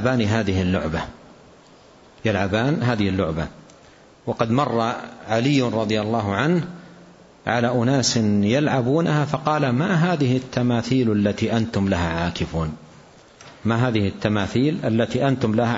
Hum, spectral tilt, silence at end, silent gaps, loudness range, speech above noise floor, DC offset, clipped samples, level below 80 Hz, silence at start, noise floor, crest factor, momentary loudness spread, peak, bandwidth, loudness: none; -6 dB/octave; 0 s; none; 4 LU; 29 dB; under 0.1%; under 0.1%; -46 dBFS; 0 s; -49 dBFS; 18 dB; 9 LU; -4 dBFS; 8 kHz; -21 LUFS